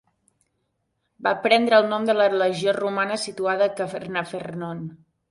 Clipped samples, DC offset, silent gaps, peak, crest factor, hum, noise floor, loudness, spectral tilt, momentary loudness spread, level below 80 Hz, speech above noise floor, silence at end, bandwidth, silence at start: under 0.1%; under 0.1%; none; -4 dBFS; 20 dB; none; -74 dBFS; -22 LUFS; -4.5 dB/octave; 13 LU; -68 dBFS; 52 dB; 0.35 s; 11.5 kHz; 1.2 s